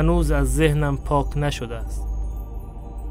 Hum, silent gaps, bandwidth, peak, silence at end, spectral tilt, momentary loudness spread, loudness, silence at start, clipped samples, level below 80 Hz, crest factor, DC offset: none; none; 15.5 kHz; -4 dBFS; 0 s; -6.5 dB/octave; 16 LU; -23 LUFS; 0 s; under 0.1%; -26 dBFS; 18 dB; under 0.1%